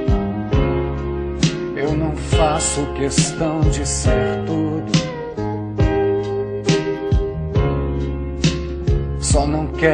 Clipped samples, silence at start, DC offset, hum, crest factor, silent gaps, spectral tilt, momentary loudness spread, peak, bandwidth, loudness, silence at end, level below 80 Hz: under 0.1%; 0 s; under 0.1%; none; 18 dB; none; -5.5 dB/octave; 6 LU; 0 dBFS; 10.5 kHz; -20 LUFS; 0 s; -26 dBFS